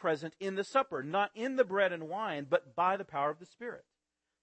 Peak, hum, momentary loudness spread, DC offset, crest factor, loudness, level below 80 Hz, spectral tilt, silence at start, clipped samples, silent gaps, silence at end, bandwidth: -14 dBFS; none; 14 LU; under 0.1%; 20 dB; -33 LUFS; -84 dBFS; -5.5 dB/octave; 0 s; under 0.1%; none; 0.65 s; 8.4 kHz